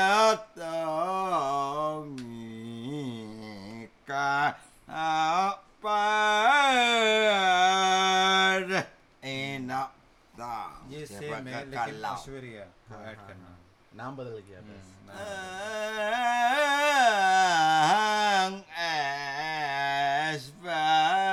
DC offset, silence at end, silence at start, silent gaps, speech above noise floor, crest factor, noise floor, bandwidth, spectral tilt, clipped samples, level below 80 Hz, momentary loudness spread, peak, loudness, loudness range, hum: under 0.1%; 0 s; 0 s; none; 23 dB; 16 dB; -57 dBFS; 15 kHz; -2.5 dB/octave; under 0.1%; -64 dBFS; 20 LU; -10 dBFS; -26 LUFS; 16 LU; none